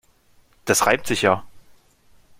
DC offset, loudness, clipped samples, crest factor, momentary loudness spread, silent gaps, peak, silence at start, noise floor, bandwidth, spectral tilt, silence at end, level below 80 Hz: under 0.1%; -20 LUFS; under 0.1%; 22 dB; 8 LU; none; -2 dBFS; 0.65 s; -57 dBFS; 16.5 kHz; -3 dB/octave; 0.8 s; -54 dBFS